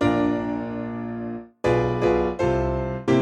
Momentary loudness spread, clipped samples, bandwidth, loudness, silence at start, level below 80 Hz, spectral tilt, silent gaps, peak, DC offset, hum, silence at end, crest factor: 9 LU; under 0.1%; 9.4 kHz; -24 LUFS; 0 s; -38 dBFS; -7.5 dB/octave; none; -8 dBFS; under 0.1%; none; 0 s; 16 dB